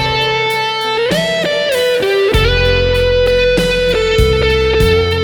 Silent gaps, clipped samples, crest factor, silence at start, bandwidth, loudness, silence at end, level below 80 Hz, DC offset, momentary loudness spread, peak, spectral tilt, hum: none; under 0.1%; 12 dB; 0 s; 19 kHz; -12 LUFS; 0 s; -22 dBFS; under 0.1%; 3 LU; 0 dBFS; -4.5 dB/octave; none